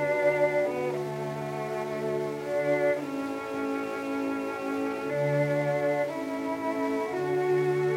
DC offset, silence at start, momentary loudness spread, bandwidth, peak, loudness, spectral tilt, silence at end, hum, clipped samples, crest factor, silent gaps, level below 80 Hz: under 0.1%; 0 s; 7 LU; 16 kHz; -14 dBFS; -29 LUFS; -7 dB/octave; 0 s; none; under 0.1%; 14 dB; none; -70 dBFS